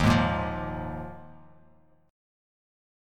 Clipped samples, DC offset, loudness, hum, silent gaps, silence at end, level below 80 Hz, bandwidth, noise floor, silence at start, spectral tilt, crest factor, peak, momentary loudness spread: under 0.1%; under 0.1%; -29 LUFS; none; none; 1.8 s; -42 dBFS; 16 kHz; -61 dBFS; 0 s; -6.5 dB/octave; 22 dB; -8 dBFS; 19 LU